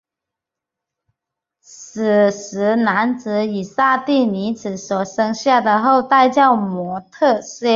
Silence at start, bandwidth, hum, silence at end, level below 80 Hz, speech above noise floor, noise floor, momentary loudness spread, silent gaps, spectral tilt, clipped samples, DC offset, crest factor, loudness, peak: 1.7 s; 7.6 kHz; none; 0 s; -64 dBFS; 68 dB; -84 dBFS; 10 LU; none; -5 dB/octave; under 0.1%; under 0.1%; 16 dB; -17 LUFS; -2 dBFS